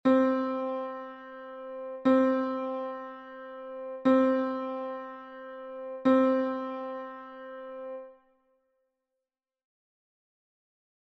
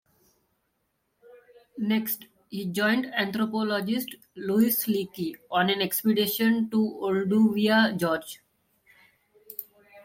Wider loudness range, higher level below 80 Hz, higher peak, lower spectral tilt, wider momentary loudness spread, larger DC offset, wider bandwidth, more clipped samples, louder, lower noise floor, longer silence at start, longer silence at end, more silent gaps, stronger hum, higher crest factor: first, 18 LU vs 5 LU; about the same, -74 dBFS vs -70 dBFS; about the same, -12 dBFS vs -10 dBFS; first, -7 dB/octave vs -4.5 dB/octave; about the same, 19 LU vs 17 LU; neither; second, 5.8 kHz vs 16.5 kHz; neither; second, -29 LUFS vs -26 LUFS; first, -89 dBFS vs -76 dBFS; second, 0.05 s vs 1.75 s; first, 2.95 s vs 0.05 s; neither; neither; about the same, 18 dB vs 16 dB